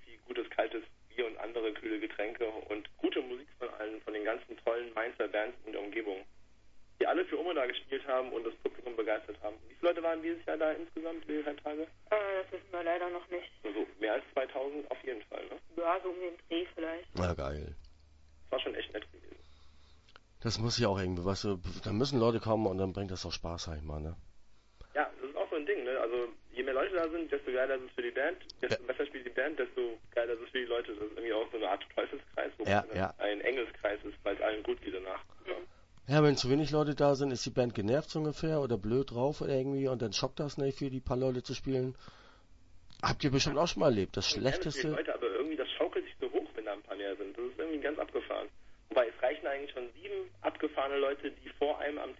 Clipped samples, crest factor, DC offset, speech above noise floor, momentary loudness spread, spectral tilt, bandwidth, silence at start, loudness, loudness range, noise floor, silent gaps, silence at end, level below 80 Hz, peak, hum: under 0.1%; 22 dB; under 0.1%; 25 dB; 11 LU; -4.5 dB/octave; 7.6 kHz; 0 s; -35 LUFS; 6 LU; -59 dBFS; none; 0.05 s; -56 dBFS; -14 dBFS; none